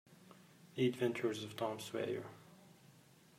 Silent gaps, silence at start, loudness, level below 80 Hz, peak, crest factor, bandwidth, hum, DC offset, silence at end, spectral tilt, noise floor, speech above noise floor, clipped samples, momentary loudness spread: none; 0.1 s; -40 LUFS; -86 dBFS; -22 dBFS; 20 dB; 16 kHz; none; under 0.1%; 0.45 s; -5.5 dB/octave; -65 dBFS; 26 dB; under 0.1%; 25 LU